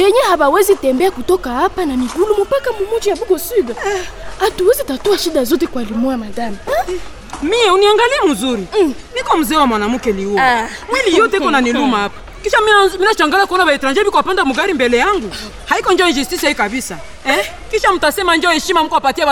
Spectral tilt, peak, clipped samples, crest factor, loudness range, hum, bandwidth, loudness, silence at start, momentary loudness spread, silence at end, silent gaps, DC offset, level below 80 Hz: -3 dB/octave; -2 dBFS; under 0.1%; 12 dB; 4 LU; none; 18 kHz; -14 LUFS; 0 s; 8 LU; 0 s; none; under 0.1%; -38 dBFS